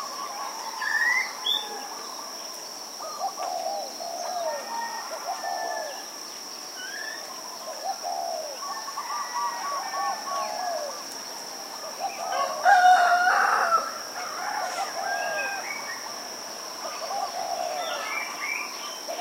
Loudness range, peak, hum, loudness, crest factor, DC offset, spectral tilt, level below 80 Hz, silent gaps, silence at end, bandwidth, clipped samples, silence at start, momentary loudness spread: 10 LU; -6 dBFS; none; -28 LUFS; 22 dB; under 0.1%; 0.5 dB/octave; -88 dBFS; none; 0 s; 16 kHz; under 0.1%; 0 s; 13 LU